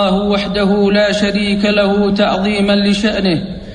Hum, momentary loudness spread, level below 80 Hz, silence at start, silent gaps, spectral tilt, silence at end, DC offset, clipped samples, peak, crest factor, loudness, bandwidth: none; 3 LU; -36 dBFS; 0 s; none; -6 dB/octave; 0 s; under 0.1%; under 0.1%; -2 dBFS; 12 dB; -13 LUFS; 10 kHz